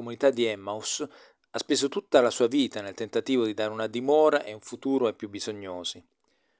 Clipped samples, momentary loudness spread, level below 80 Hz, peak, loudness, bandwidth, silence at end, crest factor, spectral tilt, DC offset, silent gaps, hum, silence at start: under 0.1%; 13 LU; -70 dBFS; -6 dBFS; -27 LUFS; 8 kHz; 0.6 s; 22 dB; -3.5 dB/octave; under 0.1%; none; none; 0 s